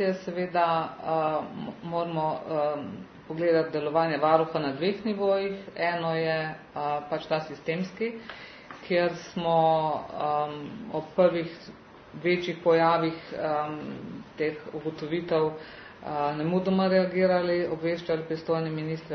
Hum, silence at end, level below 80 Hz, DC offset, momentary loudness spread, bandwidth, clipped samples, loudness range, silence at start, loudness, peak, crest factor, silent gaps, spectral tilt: none; 0 s; -64 dBFS; under 0.1%; 14 LU; 6.6 kHz; under 0.1%; 4 LU; 0 s; -28 LUFS; -6 dBFS; 22 dB; none; -7.5 dB/octave